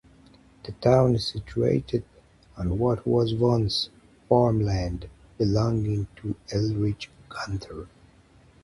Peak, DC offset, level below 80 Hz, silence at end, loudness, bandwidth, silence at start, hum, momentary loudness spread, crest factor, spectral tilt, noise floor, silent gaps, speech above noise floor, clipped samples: -6 dBFS; under 0.1%; -44 dBFS; 0.75 s; -25 LUFS; 11.5 kHz; 0.65 s; none; 15 LU; 20 dB; -7.5 dB/octave; -56 dBFS; none; 31 dB; under 0.1%